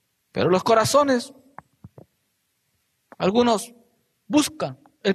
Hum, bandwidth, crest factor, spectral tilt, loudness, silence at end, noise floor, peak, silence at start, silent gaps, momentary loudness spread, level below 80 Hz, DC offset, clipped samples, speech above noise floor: none; 13.5 kHz; 18 dB; -4.5 dB/octave; -21 LUFS; 0 s; -72 dBFS; -6 dBFS; 0.35 s; none; 14 LU; -62 dBFS; under 0.1%; under 0.1%; 52 dB